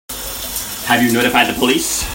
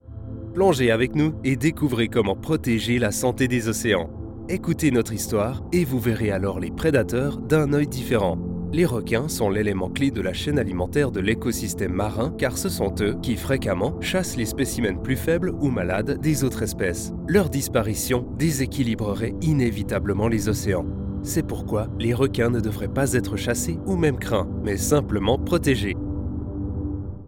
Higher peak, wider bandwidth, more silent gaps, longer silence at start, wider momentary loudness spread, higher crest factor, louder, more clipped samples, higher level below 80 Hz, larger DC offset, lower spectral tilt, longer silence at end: first, 0 dBFS vs -6 dBFS; about the same, 16.5 kHz vs 17 kHz; neither; about the same, 0.1 s vs 0.05 s; first, 9 LU vs 5 LU; about the same, 16 dB vs 16 dB; first, -15 LUFS vs -23 LUFS; neither; about the same, -38 dBFS vs -38 dBFS; neither; second, -2.5 dB/octave vs -5.5 dB/octave; about the same, 0 s vs 0 s